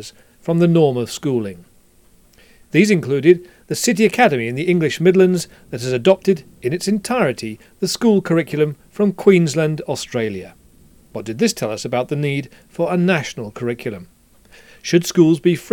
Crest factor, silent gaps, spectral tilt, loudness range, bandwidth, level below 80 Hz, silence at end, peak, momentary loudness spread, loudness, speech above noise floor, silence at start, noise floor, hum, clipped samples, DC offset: 18 dB; none; -5.5 dB/octave; 6 LU; 17.5 kHz; -56 dBFS; 0.05 s; 0 dBFS; 14 LU; -18 LUFS; 34 dB; 0 s; -51 dBFS; none; under 0.1%; under 0.1%